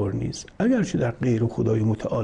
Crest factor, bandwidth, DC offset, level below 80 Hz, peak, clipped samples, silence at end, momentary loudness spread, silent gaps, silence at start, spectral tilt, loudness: 12 dB; 10 kHz; under 0.1%; -48 dBFS; -12 dBFS; under 0.1%; 0 s; 5 LU; none; 0 s; -7.5 dB/octave; -24 LUFS